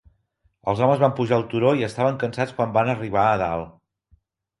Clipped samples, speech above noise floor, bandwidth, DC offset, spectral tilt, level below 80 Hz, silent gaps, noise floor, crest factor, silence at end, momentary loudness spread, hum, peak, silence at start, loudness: under 0.1%; 46 dB; 11.5 kHz; under 0.1%; -7.5 dB/octave; -52 dBFS; none; -67 dBFS; 20 dB; 0.9 s; 8 LU; none; -4 dBFS; 0.65 s; -22 LUFS